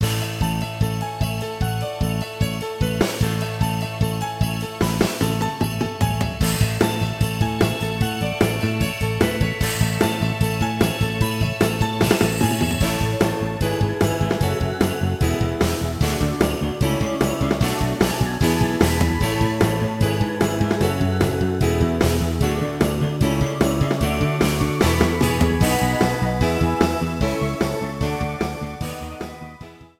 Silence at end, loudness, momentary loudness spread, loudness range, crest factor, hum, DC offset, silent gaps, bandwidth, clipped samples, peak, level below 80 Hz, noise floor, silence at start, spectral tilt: 0.15 s; -21 LUFS; 6 LU; 4 LU; 20 dB; none; under 0.1%; none; 16.5 kHz; under 0.1%; -2 dBFS; -32 dBFS; -41 dBFS; 0 s; -5.5 dB/octave